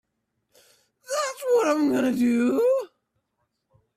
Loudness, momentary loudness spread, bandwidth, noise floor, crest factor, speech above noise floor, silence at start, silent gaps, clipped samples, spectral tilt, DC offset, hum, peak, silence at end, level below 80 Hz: -23 LUFS; 7 LU; 15 kHz; -77 dBFS; 16 dB; 55 dB; 1.1 s; none; under 0.1%; -4.5 dB/octave; under 0.1%; none; -10 dBFS; 1.1 s; -68 dBFS